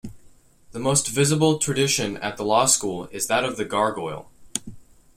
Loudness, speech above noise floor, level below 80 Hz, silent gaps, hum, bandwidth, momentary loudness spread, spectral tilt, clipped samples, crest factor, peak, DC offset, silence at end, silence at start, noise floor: -22 LUFS; 29 dB; -54 dBFS; none; none; 16.5 kHz; 13 LU; -3.5 dB/octave; under 0.1%; 20 dB; -4 dBFS; under 0.1%; 0.35 s; 0.05 s; -51 dBFS